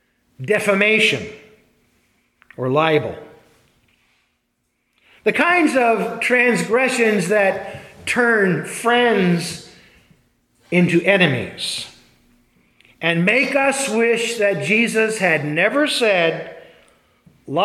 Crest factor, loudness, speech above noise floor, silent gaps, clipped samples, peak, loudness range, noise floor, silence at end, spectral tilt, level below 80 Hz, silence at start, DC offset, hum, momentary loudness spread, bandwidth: 18 dB; -17 LUFS; 53 dB; none; under 0.1%; 0 dBFS; 6 LU; -70 dBFS; 0 s; -4.5 dB/octave; -62 dBFS; 0.4 s; under 0.1%; none; 13 LU; 15 kHz